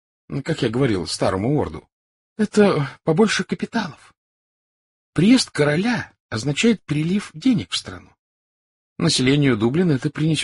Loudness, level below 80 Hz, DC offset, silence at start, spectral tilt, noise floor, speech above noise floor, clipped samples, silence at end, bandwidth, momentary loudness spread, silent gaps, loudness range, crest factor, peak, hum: -20 LUFS; -52 dBFS; under 0.1%; 0.3 s; -5.5 dB/octave; under -90 dBFS; over 71 dB; under 0.1%; 0 s; 11.5 kHz; 10 LU; 1.93-2.36 s, 4.17-5.13 s, 6.20-6.29 s, 8.19-8.96 s; 2 LU; 18 dB; -4 dBFS; none